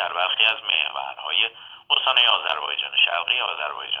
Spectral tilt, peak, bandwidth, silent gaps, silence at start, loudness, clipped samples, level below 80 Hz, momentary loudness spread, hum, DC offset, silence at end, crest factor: -0.5 dB/octave; -2 dBFS; 6.6 kHz; none; 0 s; -20 LUFS; under 0.1%; -76 dBFS; 10 LU; none; under 0.1%; 0 s; 20 dB